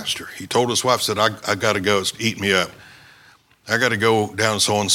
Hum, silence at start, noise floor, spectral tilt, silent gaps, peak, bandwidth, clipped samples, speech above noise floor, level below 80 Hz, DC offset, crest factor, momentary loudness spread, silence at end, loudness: none; 0 s; -52 dBFS; -3 dB/octave; none; 0 dBFS; 18 kHz; under 0.1%; 32 dB; -60 dBFS; under 0.1%; 20 dB; 6 LU; 0 s; -19 LUFS